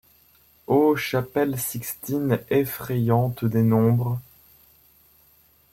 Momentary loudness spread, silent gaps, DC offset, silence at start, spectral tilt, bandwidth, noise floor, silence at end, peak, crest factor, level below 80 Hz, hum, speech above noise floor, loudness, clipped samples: 9 LU; none; under 0.1%; 0.7 s; -7 dB/octave; 16.5 kHz; -58 dBFS; 1.5 s; -6 dBFS; 18 dB; -58 dBFS; none; 36 dB; -23 LUFS; under 0.1%